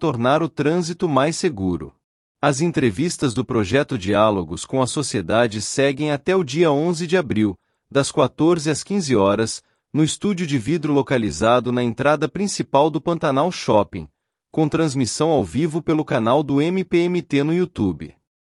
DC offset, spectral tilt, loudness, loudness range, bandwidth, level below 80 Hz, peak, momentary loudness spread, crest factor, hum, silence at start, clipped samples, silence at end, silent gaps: under 0.1%; -5.5 dB/octave; -20 LUFS; 1 LU; 12 kHz; -52 dBFS; -4 dBFS; 6 LU; 16 dB; none; 0 s; under 0.1%; 0.45 s; 2.04-2.35 s